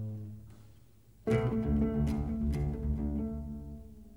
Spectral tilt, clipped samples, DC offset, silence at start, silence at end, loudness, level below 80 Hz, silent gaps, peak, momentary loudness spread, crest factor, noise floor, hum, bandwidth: -9 dB/octave; under 0.1%; 0.1%; 0 s; 0 s; -34 LUFS; -40 dBFS; none; -18 dBFS; 17 LU; 16 dB; -60 dBFS; none; 12 kHz